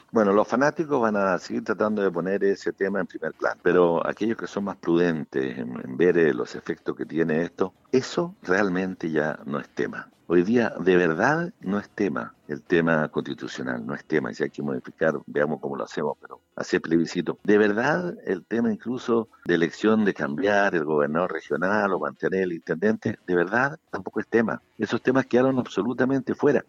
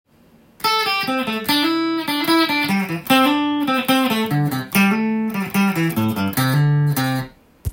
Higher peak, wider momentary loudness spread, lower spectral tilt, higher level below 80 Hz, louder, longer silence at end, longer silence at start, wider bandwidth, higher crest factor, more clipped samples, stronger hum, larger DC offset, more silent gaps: second, -6 dBFS vs 0 dBFS; first, 10 LU vs 5 LU; first, -6.5 dB/octave vs -5 dB/octave; second, -64 dBFS vs -46 dBFS; second, -25 LUFS vs -18 LUFS; about the same, 0.05 s vs 0 s; second, 0.15 s vs 0.6 s; second, 7.8 kHz vs 17 kHz; about the same, 18 dB vs 18 dB; neither; neither; neither; neither